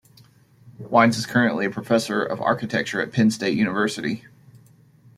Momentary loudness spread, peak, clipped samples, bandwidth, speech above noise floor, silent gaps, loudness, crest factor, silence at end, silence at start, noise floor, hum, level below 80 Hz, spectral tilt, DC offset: 9 LU; -2 dBFS; under 0.1%; 14.5 kHz; 32 dB; none; -22 LUFS; 20 dB; 1 s; 0.65 s; -53 dBFS; none; -62 dBFS; -5.5 dB/octave; under 0.1%